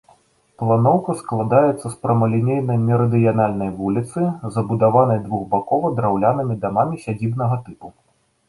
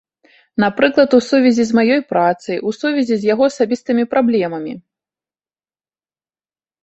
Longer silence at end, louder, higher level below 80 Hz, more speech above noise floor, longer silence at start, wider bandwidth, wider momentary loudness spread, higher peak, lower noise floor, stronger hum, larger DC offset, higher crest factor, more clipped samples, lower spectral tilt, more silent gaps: second, 0.6 s vs 2.05 s; second, -19 LUFS vs -15 LUFS; first, -52 dBFS vs -60 dBFS; second, 37 dB vs over 75 dB; about the same, 0.6 s vs 0.6 s; first, 11.5 kHz vs 8.2 kHz; about the same, 8 LU vs 10 LU; about the same, -2 dBFS vs -2 dBFS; second, -55 dBFS vs under -90 dBFS; neither; neither; about the same, 16 dB vs 16 dB; neither; first, -9.5 dB/octave vs -5.5 dB/octave; neither